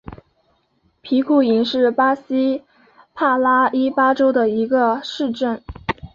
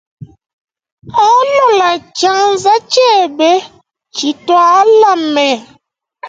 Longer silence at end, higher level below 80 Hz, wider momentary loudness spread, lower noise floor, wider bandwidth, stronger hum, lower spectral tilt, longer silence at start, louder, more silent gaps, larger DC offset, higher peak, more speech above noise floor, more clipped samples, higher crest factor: about the same, 0.05 s vs 0 s; first, -48 dBFS vs -58 dBFS; about the same, 9 LU vs 10 LU; first, -63 dBFS vs -55 dBFS; second, 7.4 kHz vs 9.2 kHz; neither; first, -6 dB/octave vs -2.5 dB/octave; about the same, 0.1 s vs 0.2 s; second, -18 LUFS vs -10 LUFS; second, none vs 0.53-0.65 s, 0.92-0.97 s; neither; second, -4 dBFS vs 0 dBFS; about the same, 46 dB vs 45 dB; neither; about the same, 14 dB vs 12 dB